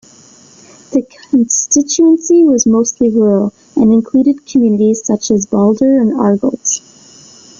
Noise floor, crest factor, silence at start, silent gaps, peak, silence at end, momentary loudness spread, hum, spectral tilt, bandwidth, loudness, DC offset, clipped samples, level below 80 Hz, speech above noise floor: -42 dBFS; 10 dB; 0.9 s; none; -2 dBFS; 0.8 s; 7 LU; none; -5.5 dB/octave; 7.6 kHz; -12 LUFS; under 0.1%; under 0.1%; -50 dBFS; 31 dB